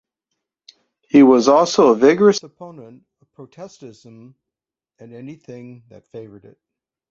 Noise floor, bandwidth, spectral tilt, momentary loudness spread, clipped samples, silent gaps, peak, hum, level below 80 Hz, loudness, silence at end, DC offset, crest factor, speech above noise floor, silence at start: -87 dBFS; 7.6 kHz; -5.5 dB/octave; 27 LU; under 0.1%; none; -2 dBFS; none; -62 dBFS; -13 LUFS; 0.85 s; under 0.1%; 18 dB; 70 dB; 1.15 s